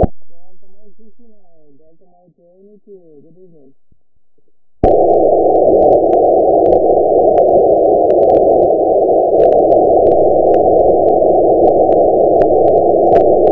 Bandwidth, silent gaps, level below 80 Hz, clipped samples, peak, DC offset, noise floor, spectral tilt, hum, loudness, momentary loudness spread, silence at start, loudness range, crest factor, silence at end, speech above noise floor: 3.9 kHz; none; -34 dBFS; 0.1%; 0 dBFS; under 0.1%; -64 dBFS; -11.5 dB/octave; none; -10 LUFS; 2 LU; 0 s; 6 LU; 12 dB; 0 s; 35 dB